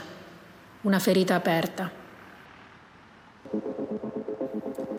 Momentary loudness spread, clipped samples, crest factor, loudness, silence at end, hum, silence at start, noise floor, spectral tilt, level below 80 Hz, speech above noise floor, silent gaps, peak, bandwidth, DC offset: 26 LU; under 0.1%; 18 dB; -28 LUFS; 0 s; none; 0 s; -53 dBFS; -5.5 dB/octave; -70 dBFS; 28 dB; none; -12 dBFS; 16 kHz; under 0.1%